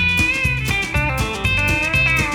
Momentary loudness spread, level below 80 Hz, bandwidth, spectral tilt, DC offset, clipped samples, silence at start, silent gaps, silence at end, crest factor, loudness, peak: 4 LU; -28 dBFS; over 20 kHz; -4 dB/octave; under 0.1%; under 0.1%; 0 s; none; 0 s; 14 dB; -17 LUFS; -4 dBFS